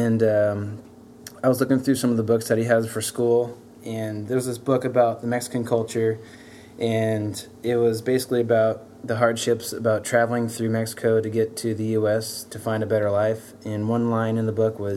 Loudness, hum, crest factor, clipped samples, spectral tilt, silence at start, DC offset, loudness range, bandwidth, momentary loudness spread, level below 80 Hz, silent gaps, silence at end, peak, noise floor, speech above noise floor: -23 LUFS; none; 18 dB; under 0.1%; -6 dB/octave; 0 s; under 0.1%; 2 LU; 16 kHz; 10 LU; -66 dBFS; none; 0 s; -6 dBFS; -44 dBFS; 21 dB